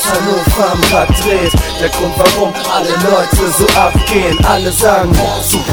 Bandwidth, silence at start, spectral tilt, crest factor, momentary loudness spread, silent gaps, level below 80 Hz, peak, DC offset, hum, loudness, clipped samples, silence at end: over 20 kHz; 0 s; -4 dB/octave; 10 dB; 4 LU; none; -20 dBFS; 0 dBFS; under 0.1%; none; -11 LUFS; 0.4%; 0 s